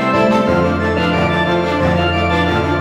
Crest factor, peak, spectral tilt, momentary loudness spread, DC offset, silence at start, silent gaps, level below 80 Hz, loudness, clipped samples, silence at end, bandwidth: 12 dB; -2 dBFS; -7 dB/octave; 2 LU; under 0.1%; 0 s; none; -34 dBFS; -15 LUFS; under 0.1%; 0 s; 11 kHz